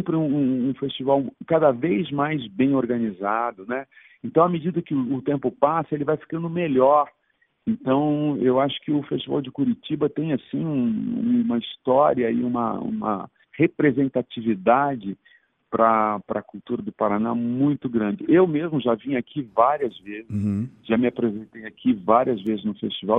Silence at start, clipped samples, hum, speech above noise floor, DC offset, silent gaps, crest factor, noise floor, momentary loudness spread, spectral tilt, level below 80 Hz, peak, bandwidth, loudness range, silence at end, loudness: 0 s; under 0.1%; none; 43 dB; under 0.1%; none; 20 dB; -65 dBFS; 10 LU; -10 dB/octave; -62 dBFS; -2 dBFS; 3.9 kHz; 2 LU; 0 s; -23 LUFS